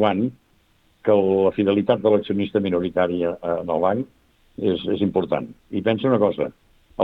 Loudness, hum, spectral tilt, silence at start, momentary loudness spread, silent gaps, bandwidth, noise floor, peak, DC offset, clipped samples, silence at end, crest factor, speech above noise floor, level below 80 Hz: -22 LUFS; none; -9 dB/octave; 0 s; 9 LU; none; 4.3 kHz; -60 dBFS; -4 dBFS; under 0.1%; under 0.1%; 0 s; 18 dB; 40 dB; -58 dBFS